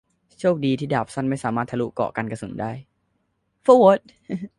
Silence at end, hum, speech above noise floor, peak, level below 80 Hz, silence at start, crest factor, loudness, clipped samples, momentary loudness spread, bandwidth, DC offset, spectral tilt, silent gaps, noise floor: 0.1 s; none; 50 dB; -2 dBFS; -58 dBFS; 0.4 s; 20 dB; -21 LUFS; under 0.1%; 17 LU; 11.5 kHz; under 0.1%; -7 dB/octave; none; -71 dBFS